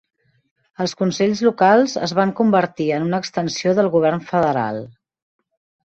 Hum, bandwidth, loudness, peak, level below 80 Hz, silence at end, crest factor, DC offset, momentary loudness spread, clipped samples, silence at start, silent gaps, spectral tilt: none; 8.2 kHz; -18 LUFS; -2 dBFS; -60 dBFS; 0.95 s; 16 dB; under 0.1%; 9 LU; under 0.1%; 0.8 s; none; -5.5 dB/octave